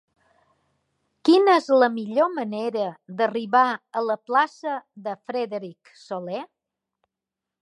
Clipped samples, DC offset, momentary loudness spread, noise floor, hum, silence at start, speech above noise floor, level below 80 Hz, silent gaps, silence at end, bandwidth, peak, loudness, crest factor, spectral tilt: under 0.1%; under 0.1%; 16 LU; -87 dBFS; none; 1.25 s; 64 dB; -82 dBFS; none; 1.15 s; 11.5 kHz; -6 dBFS; -23 LUFS; 20 dB; -5.5 dB/octave